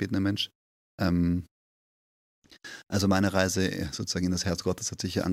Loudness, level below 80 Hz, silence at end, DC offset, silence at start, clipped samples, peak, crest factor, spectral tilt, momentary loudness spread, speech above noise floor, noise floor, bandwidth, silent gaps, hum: -28 LUFS; -52 dBFS; 0 s; under 0.1%; 0 s; under 0.1%; -8 dBFS; 22 dB; -5 dB/octave; 9 LU; over 62 dB; under -90 dBFS; 15.5 kHz; 0.55-0.98 s, 1.51-2.42 s; none